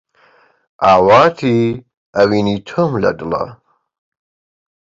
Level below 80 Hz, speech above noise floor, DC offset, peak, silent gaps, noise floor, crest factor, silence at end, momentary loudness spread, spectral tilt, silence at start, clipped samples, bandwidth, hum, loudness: -48 dBFS; 39 dB; under 0.1%; 0 dBFS; 1.97-2.13 s; -52 dBFS; 16 dB; 1.3 s; 13 LU; -7 dB/octave; 0.8 s; under 0.1%; 7.6 kHz; none; -14 LUFS